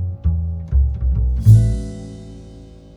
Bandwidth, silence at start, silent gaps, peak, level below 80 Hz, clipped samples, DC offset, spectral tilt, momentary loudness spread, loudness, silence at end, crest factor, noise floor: 10.5 kHz; 0 s; none; 0 dBFS; -22 dBFS; under 0.1%; under 0.1%; -9 dB/octave; 24 LU; -17 LUFS; 0.25 s; 16 dB; -39 dBFS